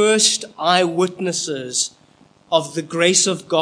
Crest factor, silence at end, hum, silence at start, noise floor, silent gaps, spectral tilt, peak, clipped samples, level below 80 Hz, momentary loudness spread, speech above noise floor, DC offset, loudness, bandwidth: 18 dB; 0 s; none; 0 s; -53 dBFS; none; -2.5 dB/octave; 0 dBFS; under 0.1%; -70 dBFS; 8 LU; 34 dB; under 0.1%; -18 LUFS; 10.5 kHz